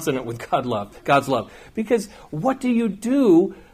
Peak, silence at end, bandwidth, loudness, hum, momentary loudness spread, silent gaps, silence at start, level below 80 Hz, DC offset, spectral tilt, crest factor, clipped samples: -4 dBFS; 0.15 s; 15.5 kHz; -21 LUFS; none; 11 LU; none; 0 s; -54 dBFS; under 0.1%; -6 dB/octave; 16 dB; under 0.1%